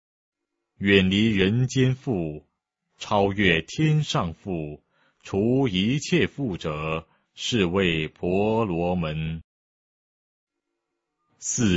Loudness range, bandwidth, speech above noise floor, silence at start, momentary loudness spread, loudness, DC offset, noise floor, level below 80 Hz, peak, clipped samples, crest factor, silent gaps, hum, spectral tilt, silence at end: 5 LU; 8 kHz; 58 dB; 0.8 s; 12 LU; -24 LUFS; under 0.1%; -81 dBFS; -50 dBFS; -4 dBFS; under 0.1%; 22 dB; 9.44-10.47 s; none; -5 dB/octave; 0 s